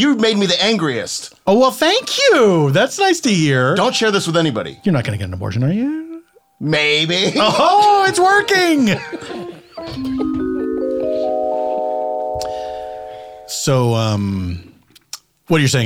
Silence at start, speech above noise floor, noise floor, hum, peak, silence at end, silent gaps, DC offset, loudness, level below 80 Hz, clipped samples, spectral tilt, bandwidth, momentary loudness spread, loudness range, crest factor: 0 s; 23 dB; -38 dBFS; none; -2 dBFS; 0 s; none; under 0.1%; -16 LUFS; -50 dBFS; under 0.1%; -4.5 dB/octave; 17.5 kHz; 16 LU; 7 LU; 14 dB